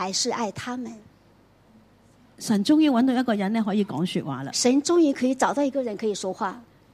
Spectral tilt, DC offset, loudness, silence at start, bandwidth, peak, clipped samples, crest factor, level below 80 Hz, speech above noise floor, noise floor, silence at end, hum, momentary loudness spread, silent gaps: -4.5 dB/octave; under 0.1%; -24 LUFS; 0 s; 15 kHz; -6 dBFS; under 0.1%; 18 dB; -66 dBFS; 34 dB; -57 dBFS; 0.3 s; none; 13 LU; none